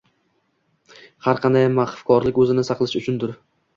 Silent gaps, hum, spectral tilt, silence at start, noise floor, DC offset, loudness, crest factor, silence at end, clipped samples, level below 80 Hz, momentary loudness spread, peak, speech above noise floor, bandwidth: none; none; -7 dB/octave; 1.25 s; -67 dBFS; under 0.1%; -20 LUFS; 18 dB; 0.4 s; under 0.1%; -54 dBFS; 8 LU; -2 dBFS; 48 dB; 7.4 kHz